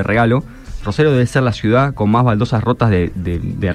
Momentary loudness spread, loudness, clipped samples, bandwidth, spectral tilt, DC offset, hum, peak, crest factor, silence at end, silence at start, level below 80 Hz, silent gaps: 8 LU; -15 LUFS; under 0.1%; 10.5 kHz; -7.5 dB/octave; under 0.1%; none; -2 dBFS; 14 dB; 0 s; 0 s; -34 dBFS; none